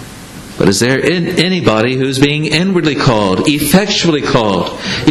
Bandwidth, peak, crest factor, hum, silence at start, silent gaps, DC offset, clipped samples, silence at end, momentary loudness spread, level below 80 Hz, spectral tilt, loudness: 13.5 kHz; 0 dBFS; 12 dB; none; 0 s; none; under 0.1%; under 0.1%; 0 s; 5 LU; -38 dBFS; -5 dB/octave; -12 LUFS